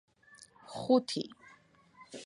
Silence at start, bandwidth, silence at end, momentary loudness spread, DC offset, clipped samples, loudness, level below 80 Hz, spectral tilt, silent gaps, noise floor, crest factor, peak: 0.7 s; 11.5 kHz; 0 s; 22 LU; under 0.1%; under 0.1%; -32 LUFS; -78 dBFS; -5 dB/octave; none; -62 dBFS; 22 dB; -14 dBFS